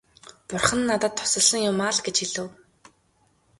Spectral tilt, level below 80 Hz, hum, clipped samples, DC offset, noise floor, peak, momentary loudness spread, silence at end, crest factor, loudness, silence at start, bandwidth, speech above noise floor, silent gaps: -2 dB/octave; -56 dBFS; none; under 0.1%; under 0.1%; -65 dBFS; -2 dBFS; 13 LU; 1.05 s; 24 dB; -22 LUFS; 0.5 s; 12 kHz; 41 dB; none